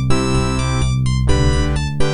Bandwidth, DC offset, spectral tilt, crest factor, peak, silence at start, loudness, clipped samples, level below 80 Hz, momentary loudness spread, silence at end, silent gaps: 11 kHz; under 0.1%; -5.5 dB/octave; 14 dB; 0 dBFS; 0 s; -18 LUFS; under 0.1%; -22 dBFS; 3 LU; 0 s; none